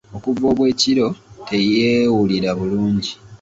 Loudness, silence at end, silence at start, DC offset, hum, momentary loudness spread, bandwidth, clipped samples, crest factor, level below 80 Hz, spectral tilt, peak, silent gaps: -18 LUFS; 0.05 s; 0.1 s; under 0.1%; none; 8 LU; 8 kHz; under 0.1%; 14 dB; -48 dBFS; -5.5 dB/octave; -4 dBFS; none